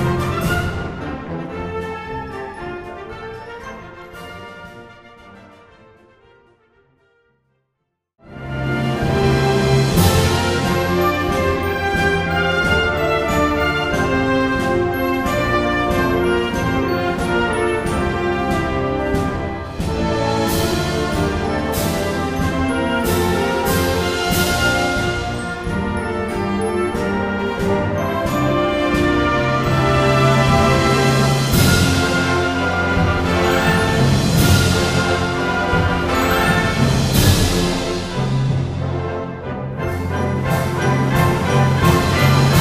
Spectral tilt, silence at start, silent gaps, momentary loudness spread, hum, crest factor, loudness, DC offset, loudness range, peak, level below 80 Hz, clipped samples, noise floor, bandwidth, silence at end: -5.5 dB/octave; 0 s; none; 12 LU; none; 18 dB; -18 LUFS; under 0.1%; 11 LU; 0 dBFS; -32 dBFS; under 0.1%; -74 dBFS; 15.5 kHz; 0 s